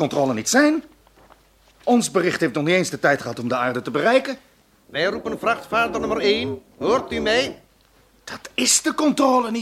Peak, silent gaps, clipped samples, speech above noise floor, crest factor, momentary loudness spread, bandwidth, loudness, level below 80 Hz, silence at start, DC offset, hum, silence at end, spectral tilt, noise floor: -4 dBFS; none; under 0.1%; 36 dB; 18 dB; 11 LU; 15.5 kHz; -20 LUFS; -54 dBFS; 0 s; under 0.1%; none; 0 s; -3.5 dB/octave; -56 dBFS